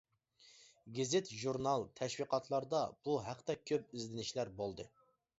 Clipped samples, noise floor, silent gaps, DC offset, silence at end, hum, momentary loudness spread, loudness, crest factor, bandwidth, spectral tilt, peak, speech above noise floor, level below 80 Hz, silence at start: under 0.1%; -68 dBFS; none; under 0.1%; 0.5 s; none; 8 LU; -40 LUFS; 20 dB; 7.6 kHz; -4.5 dB/octave; -22 dBFS; 29 dB; -72 dBFS; 0.4 s